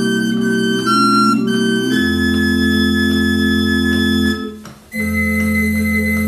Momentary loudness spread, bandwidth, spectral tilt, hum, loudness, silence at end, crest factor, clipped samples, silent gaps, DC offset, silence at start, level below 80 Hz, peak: 6 LU; 14 kHz; -5 dB/octave; none; -15 LUFS; 0 s; 12 dB; under 0.1%; none; under 0.1%; 0 s; -34 dBFS; -2 dBFS